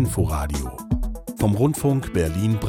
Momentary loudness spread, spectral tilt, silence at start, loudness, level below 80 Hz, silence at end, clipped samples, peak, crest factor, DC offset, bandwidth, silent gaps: 8 LU; -7 dB/octave; 0 s; -23 LUFS; -32 dBFS; 0 s; under 0.1%; -8 dBFS; 12 dB; under 0.1%; 17.5 kHz; none